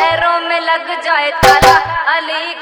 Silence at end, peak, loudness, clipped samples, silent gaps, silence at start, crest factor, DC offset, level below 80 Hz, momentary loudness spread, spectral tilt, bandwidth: 0 s; 0 dBFS; -11 LUFS; 0.4%; none; 0 s; 12 dB; under 0.1%; -32 dBFS; 8 LU; -3 dB/octave; over 20 kHz